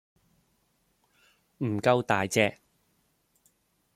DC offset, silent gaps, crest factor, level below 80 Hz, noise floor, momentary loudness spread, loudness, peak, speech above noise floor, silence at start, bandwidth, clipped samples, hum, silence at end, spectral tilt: under 0.1%; none; 26 dB; -70 dBFS; -72 dBFS; 8 LU; -27 LUFS; -6 dBFS; 46 dB; 1.6 s; 15.5 kHz; under 0.1%; none; 1.45 s; -5 dB/octave